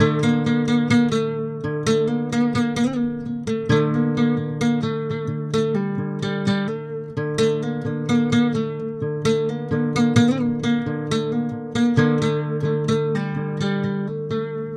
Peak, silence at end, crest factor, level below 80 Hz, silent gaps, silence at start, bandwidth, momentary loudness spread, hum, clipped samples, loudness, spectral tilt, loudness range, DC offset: -2 dBFS; 0 s; 18 dB; -54 dBFS; none; 0 s; 10 kHz; 8 LU; none; under 0.1%; -22 LUFS; -6.5 dB/octave; 2 LU; under 0.1%